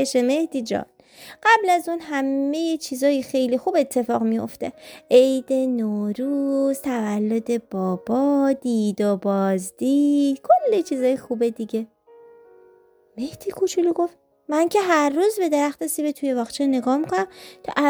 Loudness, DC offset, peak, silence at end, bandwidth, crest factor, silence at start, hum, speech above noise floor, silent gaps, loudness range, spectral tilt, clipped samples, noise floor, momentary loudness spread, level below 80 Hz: -22 LUFS; under 0.1%; -4 dBFS; 0 s; over 20 kHz; 18 dB; 0 s; none; 34 dB; none; 3 LU; -5 dB/octave; under 0.1%; -55 dBFS; 10 LU; -66 dBFS